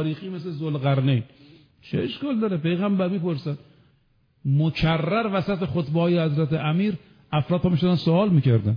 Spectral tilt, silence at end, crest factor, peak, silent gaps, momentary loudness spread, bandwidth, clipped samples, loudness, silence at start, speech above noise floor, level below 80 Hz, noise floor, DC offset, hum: -9.5 dB/octave; 0 s; 14 dB; -10 dBFS; none; 10 LU; 5.2 kHz; under 0.1%; -23 LUFS; 0 s; 41 dB; -50 dBFS; -63 dBFS; under 0.1%; none